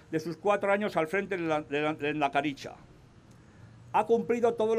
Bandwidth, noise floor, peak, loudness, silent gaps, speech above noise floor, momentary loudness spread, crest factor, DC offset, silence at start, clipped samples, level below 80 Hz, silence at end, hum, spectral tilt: 14 kHz; -55 dBFS; -14 dBFS; -29 LUFS; none; 26 dB; 7 LU; 16 dB; under 0.1%; 0.1 s; under 0.1%; -66 dBFS; 0 s; none; -6 dB/octave